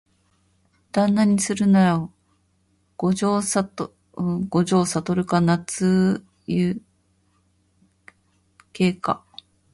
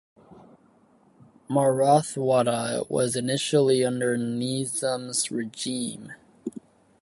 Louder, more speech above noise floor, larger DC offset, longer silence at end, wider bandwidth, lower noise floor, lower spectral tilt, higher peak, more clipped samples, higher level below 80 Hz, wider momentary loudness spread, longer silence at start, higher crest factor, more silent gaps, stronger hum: first, -22 LUFS vs -25 LUFS; first, 45 dB vs 35 dB; neither; about the same, 0.55 s vs 0.5 s; about the same, 11.5 kHz vs 12 kHz; first, -65 dBFS vs -60 dBFS; first, -6 dB/octave vs -4.5 dB/octave; about the same, -6 dBFS vs -8 dBFS; neither; first, -56 dBFS vs -68 dBFS; second, 11 LU vs 17 LU; first, 0.95 s vs 0.3 s; about the same, 16 dB vs 18 dB; neither; neither